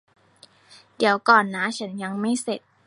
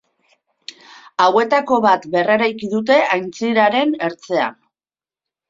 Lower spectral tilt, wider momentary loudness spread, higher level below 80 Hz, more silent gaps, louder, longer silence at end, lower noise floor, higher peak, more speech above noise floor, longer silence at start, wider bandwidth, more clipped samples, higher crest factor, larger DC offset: about the same, -4 dB/octave vs -5 dB/octave; about the same, 13 LU vs 14 LU; second, -74 dBFS vs -64 dBFS; neither; second, -22 LUFS vs -16 LUFS; second, 0.3 s vs 0.95 s; second, -55 dBFS vs under -90 dBFS; about the same, -2 dBFS vs -2 dBFS; second, 33 dB vs over 74 dB; second, 0.7 s vs 1.2 s; first, 11.5 kHz vs 7.6 kHz; neither; first, 24 dB vs 16 dB; neither